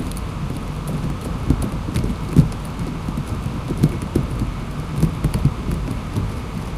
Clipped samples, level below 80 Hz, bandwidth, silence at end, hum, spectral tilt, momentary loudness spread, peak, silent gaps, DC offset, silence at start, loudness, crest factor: under 0.1%; -28 dBFS; 15.5 kHz; 0 s; none; -7 dB/octave; 8 LU; 0 dBFS; none; under 0.1%; 0 s; -23 LUFS; 20 dB